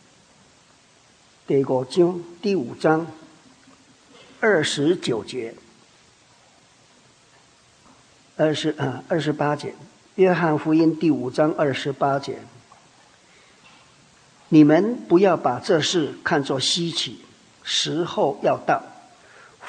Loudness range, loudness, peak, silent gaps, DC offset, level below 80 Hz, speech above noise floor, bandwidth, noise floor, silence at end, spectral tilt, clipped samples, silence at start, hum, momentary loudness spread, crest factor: 8 LU; -21 LUFS; -2 dBFS; none; under 0.1%; -68 dBFS; 35 dB; 10 kHz; -55 dBFS; 0 s; -5 dB/octave; under 0.1%; 1.5 s; none; 10 LU; 20 dB